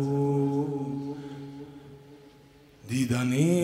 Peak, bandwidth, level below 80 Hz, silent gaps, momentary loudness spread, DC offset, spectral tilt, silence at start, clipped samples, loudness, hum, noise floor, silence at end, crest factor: -12 dBFS; 16 kHz; -62 dBFS; none; 23 LU; under 0.1%; -7 dB/octave; 0 s; under 0.1%; -28 LUFS; none; -55 dBFS; 0 s; 16 dB